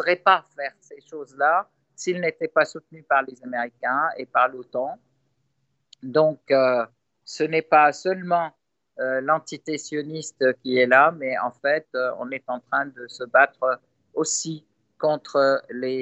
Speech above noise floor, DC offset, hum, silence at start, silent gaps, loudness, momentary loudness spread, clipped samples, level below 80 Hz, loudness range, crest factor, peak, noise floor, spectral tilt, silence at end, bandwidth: 51 dB; under 0.1%; none; 0 s; none; -23 LUFS; 15 LU; under 0.1%; -82 dBFS; 3 LU; 20 dB; -4 dBFS; -73 dBFS; -3.5 dB/octave; 0 s; 8.4 kHz